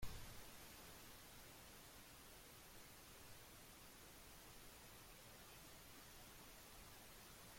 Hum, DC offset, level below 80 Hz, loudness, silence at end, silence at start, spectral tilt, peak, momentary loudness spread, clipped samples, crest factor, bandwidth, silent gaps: none; under 0.1%; -68 dBFS; -60 LUFS; 0 s; 0 s; -2.5 dB/octave; -36 dBFS; 2 LU; under 0.1%; 22 dB; 16.5 kHz; none